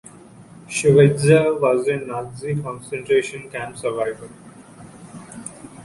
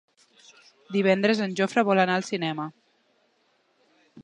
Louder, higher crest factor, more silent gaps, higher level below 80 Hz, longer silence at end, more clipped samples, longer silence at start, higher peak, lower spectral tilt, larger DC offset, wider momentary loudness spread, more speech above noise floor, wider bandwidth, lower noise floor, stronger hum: first, -19 LUFS vs -24 LUFS; about the same, 18 dB vs 20 dB; neither; first, -54 dBFS vs -78 dBFS; about the same, 0 s vs 0 s; neither; second, 0.4 s vs 0.9 s; first, -2 dBFS vs -6 dBFS; about the same, -6 dB/octave vs -5.5 dB/octave; neither; first, 23 LU vs 9 LU; second, 25 dB vs 44 dB; first, 11.5 kHz vs 10 kHz; second, -44 dBFS vs -68 dBFS; neither